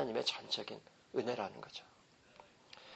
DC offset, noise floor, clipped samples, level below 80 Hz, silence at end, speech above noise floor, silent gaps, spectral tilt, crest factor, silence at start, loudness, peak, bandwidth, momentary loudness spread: under 0.1%; -63 dBFS; under 0.1%; -80 dBFS; 0 s; 22 dB; none; -3.5 dB/octave; 22 dB; 0 s; -41 LUFS; -22 dBFS; 8.2 kHz; 24 LU